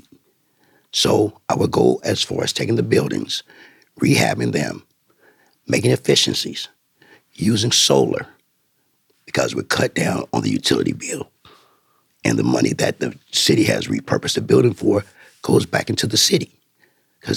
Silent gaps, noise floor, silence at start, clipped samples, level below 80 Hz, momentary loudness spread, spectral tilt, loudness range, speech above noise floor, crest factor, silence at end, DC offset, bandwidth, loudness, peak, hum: none; -66 dBFS; 0.95 s; under 0.1%; -56 dBFS; 12 LU; -4 dB/octave; 3 LU; 47 dB; 18 dB; 0 s; under 0.1%; 18 kHz; -18 LUFS; -2 dBFS; none